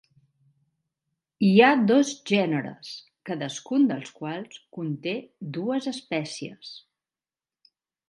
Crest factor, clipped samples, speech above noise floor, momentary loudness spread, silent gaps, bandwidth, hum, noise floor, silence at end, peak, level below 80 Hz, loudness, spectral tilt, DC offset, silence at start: 22 dB; under 0.1%; over 65 dB; 22 LU; none; 11.5 kHz; none; under -90 dBFS; 1.3 s; -4 dBFS; -76 dBFS; -25 LUFS; -5.5 dB/octave; under 0.1%; 1.4 s